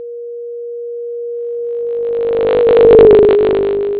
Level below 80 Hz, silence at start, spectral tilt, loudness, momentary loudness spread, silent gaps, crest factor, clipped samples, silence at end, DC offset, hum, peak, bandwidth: -38 dBFS; 0 s; -10.5 dB/octave; -10 LUFS; 20 LU; none; 12 dB; under 0.1%; 0 s; under 0.1%; none; 0 dBFS; 4 kHz